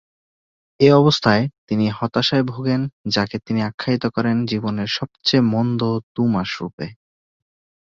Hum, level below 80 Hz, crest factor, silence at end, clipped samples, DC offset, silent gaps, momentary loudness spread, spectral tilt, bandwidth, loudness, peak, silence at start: none; -54 dBFS; 18 dB; 1 s; under 0.1%; under 0.1%; 1.58-1.67 s, 2.93-3.04 s, 3.74-3.78 s, 6.03-6.15 s, 6.73-6.78 s; 9 LU; -6.5 dB/octave; 7.6 kHz; -19 LUFS; -2 dBFS; 0.8 s